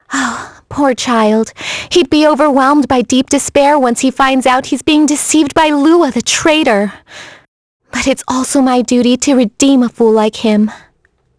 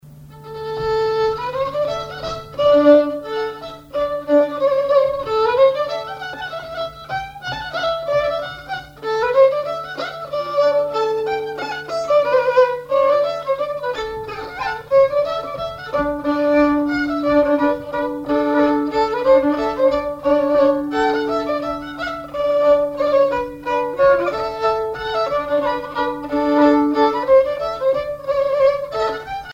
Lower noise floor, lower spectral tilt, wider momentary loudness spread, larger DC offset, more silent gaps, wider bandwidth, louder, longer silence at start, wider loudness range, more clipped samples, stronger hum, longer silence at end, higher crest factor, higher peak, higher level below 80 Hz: first, -56 dBFS vs -39 dBFS; second, -3.5 dB/octave vs -5.5 dB/octave; second, 8 LU vs 12 LU; neither; first, 7.48-7.80 s vs none; first, 11 kHz vs 8 kHz; first, -11 LUFS vs -18 LUFS; about the same, 0.1 s vs 0.05 s; about the same, 3 LU vs 3 LU; neither; neither; first, 0.6 s vs 0 s; about the same, 12 dB vs 16 dB; about the same, 0 dBFS vs -2 dBFS; about the same, -44 dBFS vs -46 dBFS